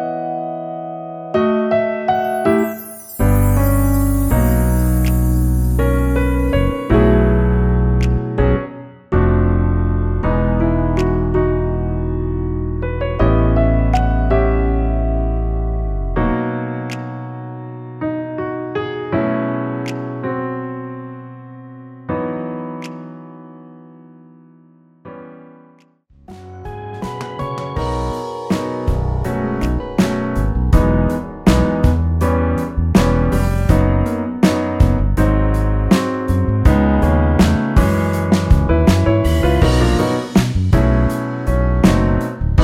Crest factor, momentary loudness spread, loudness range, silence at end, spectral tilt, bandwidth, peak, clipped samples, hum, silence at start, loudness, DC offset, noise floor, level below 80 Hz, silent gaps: 16 dB; 14 LU; 12 LU; 0 s; -7.5 dB/octave; 19 kHz; 0 dBFS; under 0.1%; none; 0 s; -17 LUFS; under 0.1%; -50 dBFS; -20 dBFS; none